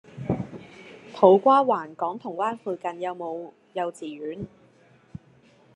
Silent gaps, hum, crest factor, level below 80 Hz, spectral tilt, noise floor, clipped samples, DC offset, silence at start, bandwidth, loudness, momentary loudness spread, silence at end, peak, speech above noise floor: none; none; 24 dB; -62 dBFS; -7.5 dB/octave; -57 dBFS; under 0.1%; under 0.1%; 0.15 s; 10.5 kHz; -24 LUFS; 27 LU; 1.3 s; -2 dBFS; 34 dB